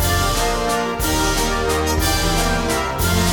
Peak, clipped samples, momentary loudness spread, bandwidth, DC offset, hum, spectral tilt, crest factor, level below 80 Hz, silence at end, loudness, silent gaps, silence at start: -4 dBFS; under 0.1%; 2 LU; 18 kHz; under 0.1%; none; -3.5 dB/octave; 14 dB; -26 dBFS; 0 s; -18 LUFS; none; 0 s